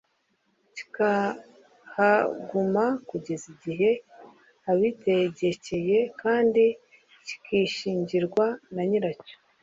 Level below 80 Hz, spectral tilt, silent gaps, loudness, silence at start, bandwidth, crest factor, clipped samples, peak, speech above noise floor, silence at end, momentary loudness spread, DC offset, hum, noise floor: -68 dBFS; -6 dB/octave; none; -26 LUFS; 0.75 s; 7.8 kHz; 18 dB; under 0.1%; -8 dBFS; 46 dB; 0.3 s; 17 LU; under 0.1%; none; -71 dBFS